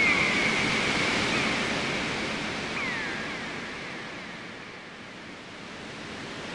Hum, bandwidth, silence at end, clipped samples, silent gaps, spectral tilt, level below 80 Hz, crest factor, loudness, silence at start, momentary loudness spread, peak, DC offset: none; 11.5 kHz; 0 s; under 0.1%; none; -3 dB/octave; -54 dBFS; 18 dB; -27 LUFS; 0 s; 17 LU; -12 dBFS; under 0.1%